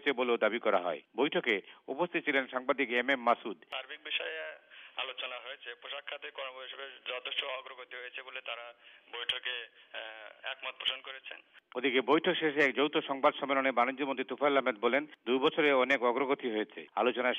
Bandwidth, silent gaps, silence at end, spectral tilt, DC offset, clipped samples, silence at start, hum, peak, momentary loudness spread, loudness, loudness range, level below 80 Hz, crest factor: 10 kHz; none; 0 s; -5 dB/octave; under 0.1%; under 0.1%; 0 s; none; -14 dBFS; 16 LU; -32 LUFS; 10 LU; -86 dBFS; 18 dB